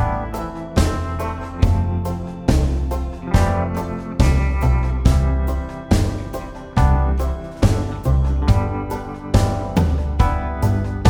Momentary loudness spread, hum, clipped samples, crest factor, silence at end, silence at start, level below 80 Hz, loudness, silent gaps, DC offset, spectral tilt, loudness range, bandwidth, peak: 8 LU; none; under 0.1%; 18 dB; 0 s; 0 s; -22 dBFS; -20 LUFS; none; under 0.1%; -7 dB/octave; 2 LU; 16 kHz; 0 dBFS